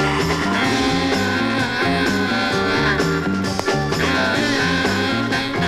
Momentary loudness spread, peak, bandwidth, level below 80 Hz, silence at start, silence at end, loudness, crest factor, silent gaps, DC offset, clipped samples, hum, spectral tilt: 3 LU; -2 dBFS; 15.5 kHz; -40 dBFS; 0 s; 0 s; -18 LUFS; 16 dB; none; under 0.1%; under 0.1%; none; -4.5 dB/octave